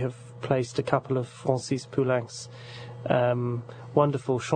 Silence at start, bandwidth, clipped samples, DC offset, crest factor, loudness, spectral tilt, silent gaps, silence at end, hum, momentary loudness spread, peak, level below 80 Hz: 0 s; 9.4 kHz; under 0.1%; under 0.1%; 22 dB; -27 LUFS; -6.5 dB/octave; none; 0 s; none; 15 LU; -6 dBFS; -62 dBFS